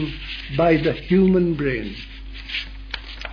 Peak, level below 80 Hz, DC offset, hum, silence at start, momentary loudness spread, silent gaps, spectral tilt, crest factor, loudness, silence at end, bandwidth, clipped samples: -6 dBFS; -36 dBFS; under 0.1%; none; 0 s; 16 LU; none; -8 dB/octave; 16 dB; -21 LUFS; 0 s; 5.4 kHz; under 0.1%